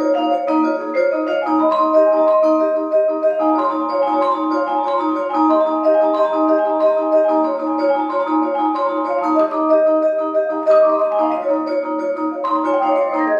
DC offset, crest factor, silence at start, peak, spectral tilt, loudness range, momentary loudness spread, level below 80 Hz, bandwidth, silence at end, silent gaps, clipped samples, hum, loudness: under 0.1%; 12 dB; 0 s; -4 dBFS; -5.5 dB/octave; 1 LU; 5 LU; -84 dBFS; 6.8 kHz; 0 s; none; under 0.1%; none; -17 LUFS